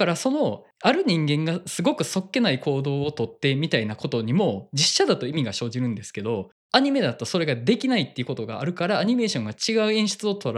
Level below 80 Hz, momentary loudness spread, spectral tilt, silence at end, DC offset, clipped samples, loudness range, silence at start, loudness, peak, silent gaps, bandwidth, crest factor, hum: -70 dBFS; 8 LU; -4.5 dB/octave; 0 s; under 0.1%; under 0.1%; 1 LU; 0 s; -24 LUFS; -2 dBFS; 6.52-6.70 s; 13.5 kHz; 22 dB; none